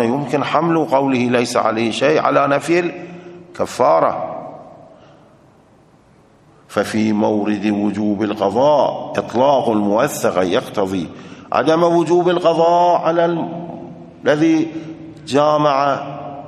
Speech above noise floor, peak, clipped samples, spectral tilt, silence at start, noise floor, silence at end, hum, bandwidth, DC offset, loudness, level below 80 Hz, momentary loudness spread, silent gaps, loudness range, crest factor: 34 dB; 0 dBFS; under 0.1%; -6 dB/octave; 0 s; -50 dBFS; 0 s; none; 13 kHz; under 0.1%; -16 LUFS; -60 dBFS; 15 LU; none; 6 LU; 16 dB